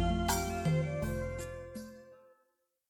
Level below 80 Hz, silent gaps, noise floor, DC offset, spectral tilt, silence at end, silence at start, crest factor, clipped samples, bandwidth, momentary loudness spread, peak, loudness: -46 dBFS; none; -78 dBFS; under 0.1%; -5.5 dB/octave; 0.75 s; 0 s; 18 dB; under 0.1%; 18 kHz; 16 LU; -18 dBFS; -35 LUFS